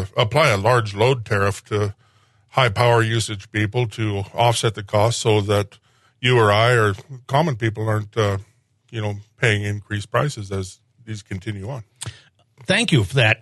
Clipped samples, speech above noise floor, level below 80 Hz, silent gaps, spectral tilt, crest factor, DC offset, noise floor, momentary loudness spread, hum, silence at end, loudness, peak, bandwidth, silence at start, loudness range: under 0.1%; 38 dB; -56 dBFS; none; -5 dB/octave; 20 dB; under 0.1%; -58 dBFS; 15 LU; none; 0.05 s; -20 LUFS; 0 dBFS; 12.5 kHz; 0 s; 6 LU